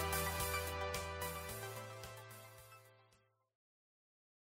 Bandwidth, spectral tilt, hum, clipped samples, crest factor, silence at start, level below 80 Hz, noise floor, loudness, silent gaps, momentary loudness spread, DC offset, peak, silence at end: 16 kHz; -3 dB/octave; none; under 0.1%; 20 dB; 0 s; -56 dBFS; -75 dBFS; -42 LUFS; none; 19 LU; under 0.1%; -26 dBFS; 1.4 s